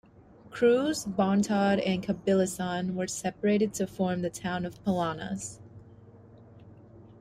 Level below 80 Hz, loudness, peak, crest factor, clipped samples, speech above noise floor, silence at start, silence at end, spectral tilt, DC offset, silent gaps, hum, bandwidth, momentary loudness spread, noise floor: -62 dBFS; -28 LUFS; -12 dBFS; 18 dB; under 0.1%; 26 dB; 0.45 s; 0.1 s; -5.5 dB/octave; under 0.1%; none; none; 15 kHz; 10 LU; -54 dBFS